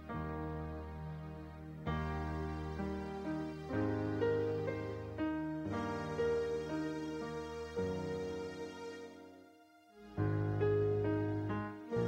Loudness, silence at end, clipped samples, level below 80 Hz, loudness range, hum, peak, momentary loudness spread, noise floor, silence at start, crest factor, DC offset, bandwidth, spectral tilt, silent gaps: -39 LUFS; 0 s; under 0.1%; -54 dBFS; 5 LU; none; -22 dBFS; 12 LU; -63 dBFS; 0 s; 16 dB; under 0.1%; 10 kHz; -8 dB/octave; none